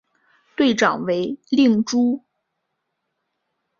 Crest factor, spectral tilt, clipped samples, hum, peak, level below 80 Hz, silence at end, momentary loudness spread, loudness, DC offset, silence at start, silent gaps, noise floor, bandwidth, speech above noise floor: 20 dB; -4.5 dB/octave; under 0.1%; none; -2 dBFS; -64 dBFS; 1.6 s; 8 LU; -19 LUFS; under 0.1%; 0.6 s; none; -76 dBFS; 7.4 kHz; 58 dB